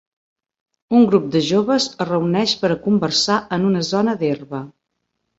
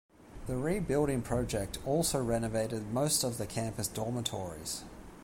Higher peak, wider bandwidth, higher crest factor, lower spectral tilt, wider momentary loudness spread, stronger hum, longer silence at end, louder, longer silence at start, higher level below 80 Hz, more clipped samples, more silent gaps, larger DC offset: first, -2 dBFS vs -16 dBFS; second, 8 kHz vs 16.5 kHz; about the same, 16 dB vs 18 dB; about the same, -5 dB/octave vs -4.5 dB/octave; about the same, 7 LU vs 9 LU; neither; first, 0.7 s vs 0 s; first, -18 LUFS vs -33 LUFS; first, 0.9 s vs 0.2 s; second, -58 dBFS vs -50 dBFS; neither; neither; neither